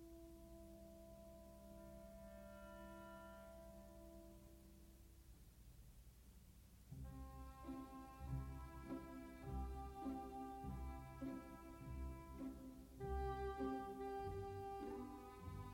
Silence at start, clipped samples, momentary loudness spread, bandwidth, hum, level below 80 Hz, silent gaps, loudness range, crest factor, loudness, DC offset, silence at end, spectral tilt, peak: 0 s; under 0.1%; 17 LU; 16.5 kHz; none; -58 dBFS; none; 12 LU; 18 dB; -53 LUFS; under 0.1%; 0 s; -7 dB/octave; -36 dBFS